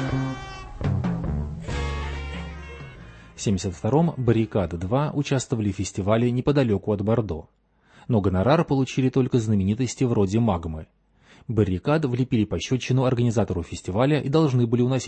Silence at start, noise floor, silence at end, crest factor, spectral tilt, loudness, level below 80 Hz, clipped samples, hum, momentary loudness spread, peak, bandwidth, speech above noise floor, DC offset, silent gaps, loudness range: 0 s; -54 dBFS; 0 s; 18 dB; -7 dB/octave; -24 LUFS; -40 dBFS; under 0.1%; none; 12 LU; -6 dBFS; 8.8 kHz; 32 dB; under 0.1%; none; 5 LU